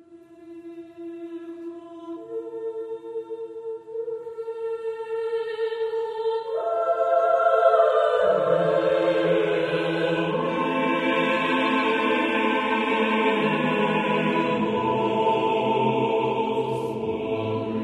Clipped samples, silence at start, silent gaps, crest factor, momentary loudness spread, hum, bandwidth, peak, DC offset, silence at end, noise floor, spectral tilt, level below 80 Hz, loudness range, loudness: under 0.1%; 0.1 s; none; 18 dB; 15 LU; none; 11 kHz; -6 dBFS; under 0.1%; 0 s; -47 dBFS; -6.5 dB/octave; -64 dBFS; 13 LU; -23 LUFS